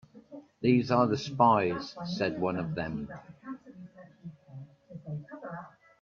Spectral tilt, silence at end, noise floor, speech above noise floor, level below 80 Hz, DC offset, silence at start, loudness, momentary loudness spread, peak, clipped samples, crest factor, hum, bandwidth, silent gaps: -7 dB/octave; 0.35 s; -51 dBFS; 23 dB; -64 dBFS; under 0.1%; 0.15 s; -29 LUFS; 25 LU; -10 dBFS; under 0.1%; 22 dB; none; 7.2 kHz; none